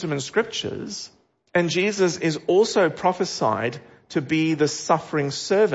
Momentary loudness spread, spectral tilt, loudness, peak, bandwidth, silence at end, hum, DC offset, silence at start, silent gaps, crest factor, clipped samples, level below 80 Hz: 10 LU; -4.5 dB/octave; -23 LUFS; -6 dBFS; 8 kHz; 0 s; none; under 0.1%; 0 s; none; 18 dB; under 0.1%; -64 dBFS